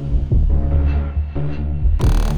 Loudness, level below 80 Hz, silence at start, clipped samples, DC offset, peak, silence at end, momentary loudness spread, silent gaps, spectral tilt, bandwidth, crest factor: -20 LUFS; -18 dBFS; 0 s; under 0.1%; under 0.1%; -4 dBFS; 0 s; 6 LU; none; -8 dB/octave; 9.6 kHz; 12 dB